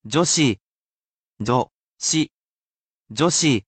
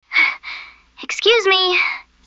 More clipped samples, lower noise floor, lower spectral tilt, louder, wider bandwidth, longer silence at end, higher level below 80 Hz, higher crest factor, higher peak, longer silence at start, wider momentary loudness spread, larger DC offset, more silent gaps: neither; first, under -90 dBFS vs -38 dBFS; first, -3.5 dB/octave vs 0 dB/octave; second, -20 LUFS vs -15 LUFS; first, 9 kHz vs 8 kHz; second, 0.05 s vs 0.25 s; about the same, -58 dBFS vs -60 dBFS; about the same, 18 dB vs 16 dB; about the same, -6 dBFS vs -4 dBFS; about the same, 0.05 s vs 0.1 s; second, 14 LU vs 19 LU; neither; first, 0.62-0.91 s, 0.97-1.31 s, 1.74-1.97 s, 2.31-3.05 s vs none